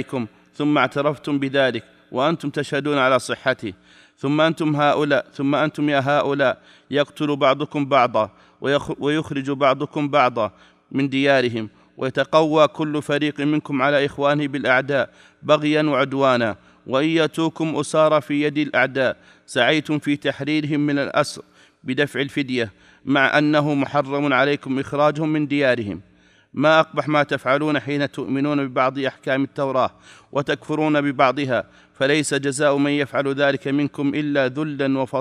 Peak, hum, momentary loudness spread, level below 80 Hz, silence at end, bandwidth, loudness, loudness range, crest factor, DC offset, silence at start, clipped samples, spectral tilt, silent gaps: -2 dBFS; none; 8 LU; -64 dBFS; 0 s; 12 kHz; -20 LUFS; 2 LU; 20 dB; under 0.1%; 0 s; under 0.1%; -5.5 dB/octave; none